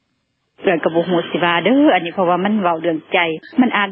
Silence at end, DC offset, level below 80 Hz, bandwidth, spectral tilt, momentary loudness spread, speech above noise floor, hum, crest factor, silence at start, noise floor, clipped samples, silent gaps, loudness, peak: 0 s; under 0.1%; -66 dBFS; 4.4 kHz; -9.5 dB/octave; 6 LU; 52 dB; none; 14 dB; 0.6 s; -68 dBFS; under 0.1%; none; -16 LUFS; -2 dBFS